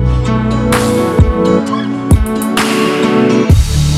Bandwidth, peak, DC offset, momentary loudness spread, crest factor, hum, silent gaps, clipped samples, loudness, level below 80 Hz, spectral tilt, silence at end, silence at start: 15.5 kHz; 0 dBFS; under 0.1%; 3 LU; 10 dB; none; none; under 0.1%; -12 LUFS; -18 dBFS; -6 dB/octave; 0 s; 0 s